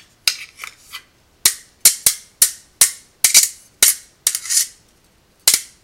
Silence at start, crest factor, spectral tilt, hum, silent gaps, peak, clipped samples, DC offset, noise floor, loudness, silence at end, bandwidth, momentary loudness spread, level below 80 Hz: 0.25 s; 20 dB; 3 dB/octave; none; none; 0 dBFS; 0.1%; under 0.1%; -55 dBFS; -15 LUFS; 0.2 s; over 20 kHz; 14 LU; -56 dBFS